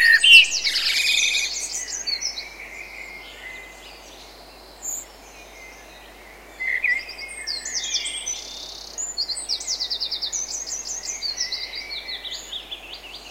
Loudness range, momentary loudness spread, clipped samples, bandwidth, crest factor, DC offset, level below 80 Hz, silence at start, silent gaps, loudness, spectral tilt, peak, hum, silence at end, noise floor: 13 LU; 20 LU; under 0.1%; 16 kHz; 24 dB; under 0.1%; -54 dBFS; 0 s; none; -20 LUFS; 2.5 dB/octave; 0 dBFS; none; 0 s; -44 dBFS